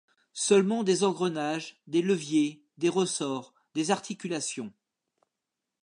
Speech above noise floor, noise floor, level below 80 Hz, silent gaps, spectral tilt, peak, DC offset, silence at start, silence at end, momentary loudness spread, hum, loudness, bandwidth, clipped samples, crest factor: 59 dB; -87 dBFS; -82 dBFS; none; -4.5 dB/octave; -10 dBFS; under 0.1%; 0.35 s; 1.15 s; 12 LU; none; -28 LUFS; 11 kHz; under 0.1%; 20 dB